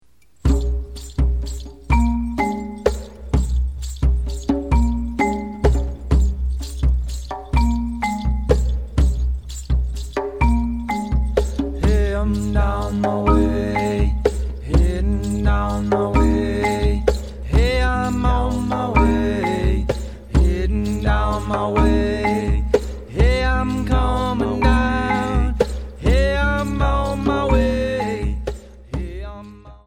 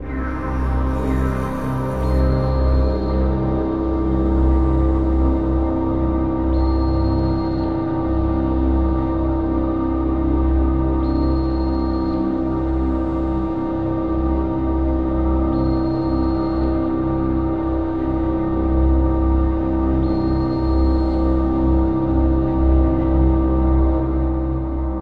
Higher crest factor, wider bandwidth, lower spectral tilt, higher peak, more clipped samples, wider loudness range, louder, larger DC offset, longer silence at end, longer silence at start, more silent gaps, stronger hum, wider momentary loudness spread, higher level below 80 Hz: first, 18 dB vs 12 dB; first, 9.8 kHz vs 4.6 kHz; second, -7 dB/octave vs -10.5 dB/octave; first, 0 dBFS vs -6 dBFS; neither; about the same, 3 LU vs 2 LU; about the same, -20 LUFS vs -20 LUFS; second, 0.3% vs 1%; about the same, 0.1 s vs 0 s; first, 0.45 s vs 0 s; neither; neither; first, 8 LU vs 4 LU; about the same, -22 dBFS vs -22 dBFS